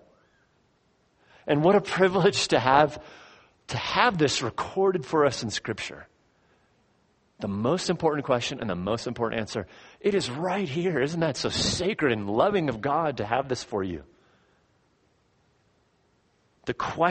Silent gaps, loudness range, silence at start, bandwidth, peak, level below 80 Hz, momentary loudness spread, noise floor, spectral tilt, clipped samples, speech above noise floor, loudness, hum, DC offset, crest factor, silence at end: none; 8 LU; 1.45 s; 8.8 kHz; -4 dBFS; -56 dBFS; 13 LU; -67 dBFS; -4.5 dB/octave; under 0.1%; 42 dB; -26 LUFS; none; under 0.1%; 24 dB; 0 s